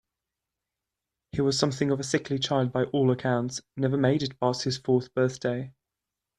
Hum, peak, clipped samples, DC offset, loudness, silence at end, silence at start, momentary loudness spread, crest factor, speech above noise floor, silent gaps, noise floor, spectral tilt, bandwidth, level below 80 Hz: none; -8 dBFS; under 0.1%; under 0.1%; -27 LUFS; 0.7 s; 1.35 s; 6 LU; 20 dB; 61 dB; none; -87 dBFS; -5.5 dB/octave; 11.5 kHz; -62 dBFS